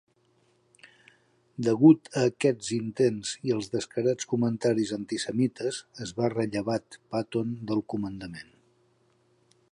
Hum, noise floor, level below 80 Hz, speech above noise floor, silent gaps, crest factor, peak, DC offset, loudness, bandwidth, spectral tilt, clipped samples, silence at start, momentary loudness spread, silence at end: none; -67 dBFS; -66 dBFS; 40 dB; none; 22 dB; -6 dBFS; under 0.1%; -28 LUFS; 11 kHz; -6 dB/octave; under 0.1%; 1.6 s; 12 LU; 1.3 s